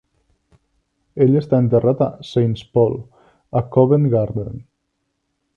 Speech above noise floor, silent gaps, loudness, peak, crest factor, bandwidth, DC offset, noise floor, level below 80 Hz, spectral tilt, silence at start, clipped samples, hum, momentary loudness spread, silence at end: 56 dB; none; -18 LUFS; 0 dBFS; 18 dB; 7 kHz; under 0.1%; -72 dBFS; -50 dBFS; -10 dB/octave; 1.15 s; under 0.1%; none; 15 LU; 0.95 s